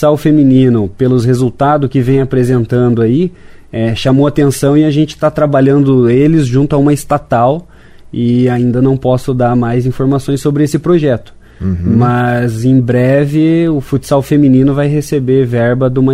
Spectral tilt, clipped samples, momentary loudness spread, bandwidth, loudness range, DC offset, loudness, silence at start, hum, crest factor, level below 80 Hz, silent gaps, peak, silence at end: -8 dB/octave; under 0.1%; 5 LU; 15.5 kHz; 2 LU; under 0.1%; -11 LUFS; 0 s; none; 10 dB; -36 dBFS; none; 0 dBFS; 0 s